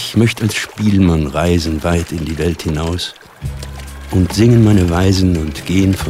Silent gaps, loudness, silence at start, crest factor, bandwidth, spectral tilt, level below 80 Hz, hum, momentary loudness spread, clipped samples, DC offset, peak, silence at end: none; -15 LUFS; 0 s; 14 dB; 16 kHz; -6 dB/octave; -28 dBFS; none; 16 LU; under 0.1%; under 0.1%; 0 dBFS; 0 s